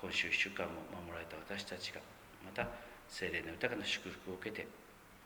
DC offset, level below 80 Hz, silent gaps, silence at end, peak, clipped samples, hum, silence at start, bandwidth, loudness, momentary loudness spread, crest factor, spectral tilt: under 0.1%; -66 dBFS; none; 0 s; -20 dBFS; under 0.1%; none; 0 s; over 20 kHz; -41 LUFS; 18 LU; 24 dB; -3 dB/octave